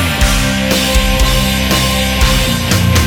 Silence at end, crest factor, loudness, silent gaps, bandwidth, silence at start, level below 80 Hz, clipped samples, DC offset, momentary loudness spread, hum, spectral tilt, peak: 0 s; 12 dB; -12 LUFS; none; 19 kHz; 0 s; -16 dBFS; under 0.1%; under 0.1%; 1 LU; none; -4 dB/octave; 0 dBFS